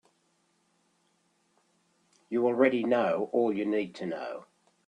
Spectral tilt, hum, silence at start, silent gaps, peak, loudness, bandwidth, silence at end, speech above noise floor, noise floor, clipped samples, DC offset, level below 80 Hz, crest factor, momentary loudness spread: -7 dB/octave; none; 2.3 s; none; -10 dBFS; -28 LUFS; 9.8 kHz; 0.45 s; 44 dB; -72 dBFS; under 0.1%; under 0.1%; -78 dBFS; 22 dB; 13 LU